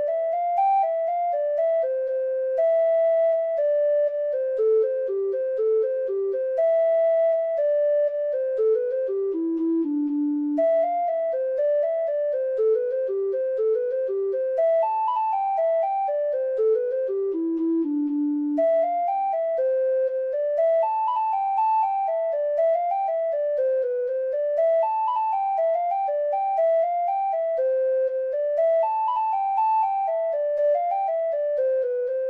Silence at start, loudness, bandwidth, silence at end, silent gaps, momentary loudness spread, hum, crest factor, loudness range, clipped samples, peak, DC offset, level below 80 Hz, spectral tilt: 0 s; -23 LUFS; 4.2 kHz; 0 s; none; 4 LU; none; 10 dB; 1 LU; under 0.1%; -14 dBFS; under 0.1%; -76 dBFS; -6.5 dB/octave